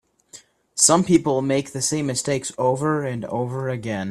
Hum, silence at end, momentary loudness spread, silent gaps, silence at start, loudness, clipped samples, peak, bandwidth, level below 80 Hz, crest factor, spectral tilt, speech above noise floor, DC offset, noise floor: none; 0 s; 11 LU; none; 0.35 s; -21 LUFS; under 0.1%; 0 dBFS; 14 kHz; -58 dBFS; 22 dB; -4 dB/octave; 27 dB; under 0.1%; -48 dBFS